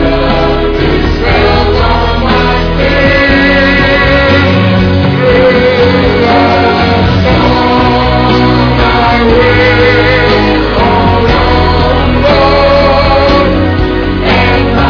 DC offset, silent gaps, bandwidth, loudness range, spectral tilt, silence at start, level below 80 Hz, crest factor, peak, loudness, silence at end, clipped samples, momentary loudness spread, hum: under 0.1%; none; 5.4 kHz; 1 LU; -7.5 dB/octave; 0 s; -16 dBFS; 6 dB; 0 dBFS; -7 LUFS; 0 s; under 0.1%; 4 LU; none